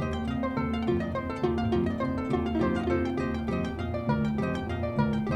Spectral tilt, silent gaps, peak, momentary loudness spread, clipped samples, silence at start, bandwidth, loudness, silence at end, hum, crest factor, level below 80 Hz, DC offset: -8 dB/octave; none; -12 dBFS; 4 LU; under 0.1%; 0 s; 9.2 kHz; -29 LUFS; 0 s; none; 16 dB; -42 dBFS; under 0.1%